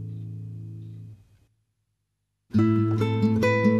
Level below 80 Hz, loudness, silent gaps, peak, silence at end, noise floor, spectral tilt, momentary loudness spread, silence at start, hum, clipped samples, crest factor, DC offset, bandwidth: -58 dBFS; -23 LUFS; none; -8 dBFS; 0 s; -78 dBFS; -8.5 dB/octave; 19 LU; 0 s; 50 Hz at -50 dBFS; under 0.1%; 16 dB; under 0.1%; 7.4 kHz